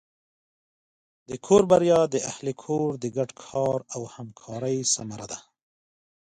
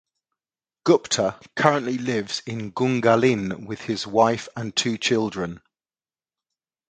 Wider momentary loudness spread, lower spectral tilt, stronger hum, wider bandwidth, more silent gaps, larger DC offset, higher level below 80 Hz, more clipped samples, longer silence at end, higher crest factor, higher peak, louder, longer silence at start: first, 19 LU vs 10 LU; about the same, -4.5 dB/octave vs -4.5 dB/octave; neither; about the same, 10.5 kHz vs 9.6 kHz; neither; neither; about the same, -62 dBFS vs -60 dBFS; neither; second, 0.9 s vs 1.3 s; about the same, 22 dB vs 24 dB; second, -6 dBFS vs 0 dBFS; about the same, -24 LUFS vs -23 LUFS; first, 1.3 s vs 0.85 s